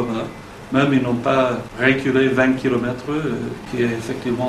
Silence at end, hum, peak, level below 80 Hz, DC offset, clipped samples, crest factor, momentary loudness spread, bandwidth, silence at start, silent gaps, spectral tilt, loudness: 0 s; none; -2 dBFS; -46 dBFS; under 0.1%; under 0.1%; 18 dB; 10 LU; 12.5 kHz; 0 s; none; -6.5 dB/octave; -19 LUFS